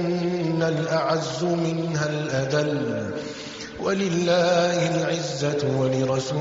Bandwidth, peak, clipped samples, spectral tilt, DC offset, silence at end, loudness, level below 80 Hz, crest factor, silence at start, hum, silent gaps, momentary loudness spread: 7.8 kHz; -10 dBFS; under 0.1%; -5 dB/octave; under 0.1%; 0 s; -24 LUFS; -58 dBFS; 14 dB; 0 s; none; none; 9 LU